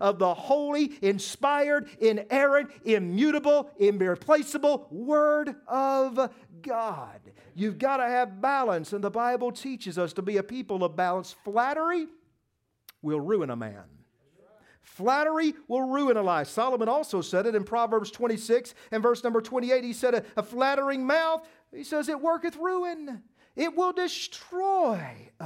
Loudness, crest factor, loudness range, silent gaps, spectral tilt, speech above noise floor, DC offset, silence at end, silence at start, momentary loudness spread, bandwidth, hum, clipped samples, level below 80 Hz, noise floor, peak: -27 LUFS; 20 dB; 5 LU; none; -5 dB/octave; 50 dB; under 0.1%; 0 s; 0 s; 9 LU; 16.5 kHz; none; under 0.1%; -76 dBFS; -77 dBFS; -8 dBFS